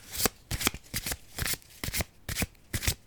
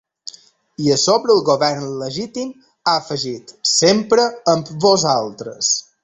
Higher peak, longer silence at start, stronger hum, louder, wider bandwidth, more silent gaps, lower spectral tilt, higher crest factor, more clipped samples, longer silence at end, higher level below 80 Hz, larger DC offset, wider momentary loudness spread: about the same, -4 dBFS vs -2 dBFS; second, 0 s vs 0.8 s; neither; second, -32 LUFS vs -17 LUFS; first, over 20 kHz vs 8.4 kHz; neither; about the same, -2.5 dB/octave vs -3.5 dB/octave; first, 30 dB vs 16 dB; neither; about the same, 0.1 s vs 0.2 s; first, -42 dBFS vs -58 dBFS; neither; second, 5 LU vs 14 LU